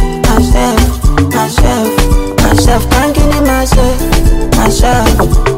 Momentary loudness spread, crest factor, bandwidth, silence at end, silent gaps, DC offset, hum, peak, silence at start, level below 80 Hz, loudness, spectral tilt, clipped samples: 2 LU; 8 dB; 16.5 kHz; 0 s; none; under 0.1%; none; 0 dBFS; 0 s; -12 dBFS; -10 LUFS; -5 dB/octave; under 0.1%